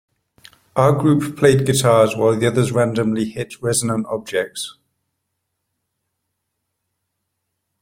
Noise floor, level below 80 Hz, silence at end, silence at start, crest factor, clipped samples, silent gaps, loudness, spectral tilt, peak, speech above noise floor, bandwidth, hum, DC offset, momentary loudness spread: -76 dBFS; -54 dBFS; 3.1 s; 0.75 s; 18 dB; under 0.1%; none; -18 LUFS; -5.5 dB/octave; -2 dBFS; 59 dB; 16.5 kHz; none; under 0.1%; 11 LU